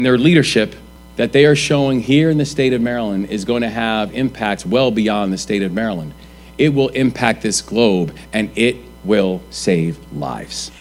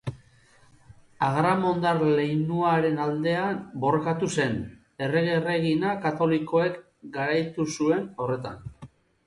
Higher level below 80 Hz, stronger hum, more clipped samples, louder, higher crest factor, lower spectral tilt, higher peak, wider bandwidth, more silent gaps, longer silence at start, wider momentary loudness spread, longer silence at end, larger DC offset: first, -42 dBFS vs -58 dBFS; neither; neither; first, -17 LUFS vs -25 LUFS; about the same, 16 dB vs 16 dB; second, -5 dB/octave vs -6.5 dB/octave; first, 0 dBFS vs -10 dBFS; first, 16 kHz vs 11.5 kHz; neither; about the same, 0 s vs 0.05 s; about the same, 12 LU vs 10 LU; second, 0 s vs 0.4 s; neither